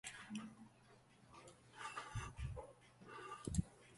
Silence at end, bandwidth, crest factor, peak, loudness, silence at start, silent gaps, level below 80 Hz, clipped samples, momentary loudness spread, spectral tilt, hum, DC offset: 0 s; 11.5 kHz; 26 dB; -24 dBFS; -49 LUFS; 0.05 s; none; -58 dBFS; under 0.1%; 20 LU; -5 dB/octave; none; under 0.1%